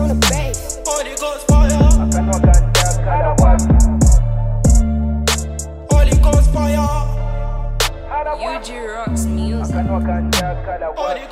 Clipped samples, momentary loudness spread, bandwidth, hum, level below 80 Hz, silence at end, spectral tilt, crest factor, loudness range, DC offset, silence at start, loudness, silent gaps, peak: under 0.1%; 11 LU; 16 kHz; none; -16 dBFS; 0 s; -5 dB/octave; 14 dB; 7 LU; under 0.1%; 0 s; -16 LUFS; none; 0 dBFS